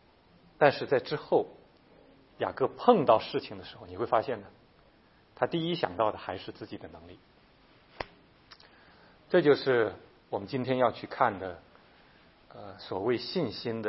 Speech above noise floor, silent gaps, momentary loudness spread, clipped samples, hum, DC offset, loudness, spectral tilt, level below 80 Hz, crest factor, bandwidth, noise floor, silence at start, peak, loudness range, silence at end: 33 dB; none; 20 LU; under 0.1%; none; under 0.1%; -29 LUFS; -9.5 dB/octave; -66 dBFS; 26 dB; 5.8 kHz; -62 dBFS; 0.6 s; -4 dBFS; 6 LU; 0 s